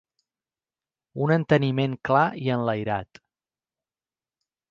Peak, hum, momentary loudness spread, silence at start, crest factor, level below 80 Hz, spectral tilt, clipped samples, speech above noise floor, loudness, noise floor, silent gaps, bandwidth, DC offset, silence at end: -6 dBFS; none; 9 LU; 1.15 s; 20 dB; -60 dBFS; -8.5 dB/octave; under 0.1%; over 67 dB; -24 LUFS; under -90 dBFS; none; 7.2 kHz; under 0.1%; 1.65 s